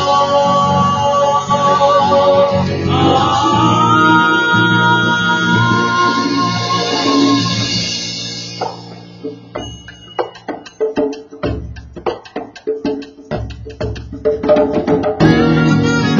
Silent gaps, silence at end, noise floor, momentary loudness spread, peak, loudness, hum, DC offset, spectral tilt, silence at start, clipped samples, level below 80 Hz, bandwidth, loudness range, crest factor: none; 0 s; -33 dBFS; 16 LU; 0 dBFS; -13 LUFS; none; under 0.1%; -5 dB/octave; 0 s; under 0.1%; -38 dBFS; 7.6 kHz; 12 LU; 14 dB